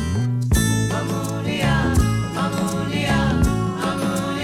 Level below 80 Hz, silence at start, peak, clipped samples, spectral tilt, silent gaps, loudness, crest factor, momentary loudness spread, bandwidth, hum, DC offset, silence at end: -30 dBFS; 0 s; -6 dBFS; under 0.1%; -5.5 dB/octave; none; -21 LUFS; 14 dB; 5 LU; 16.5 kHz; none; under 0.1%; 0 s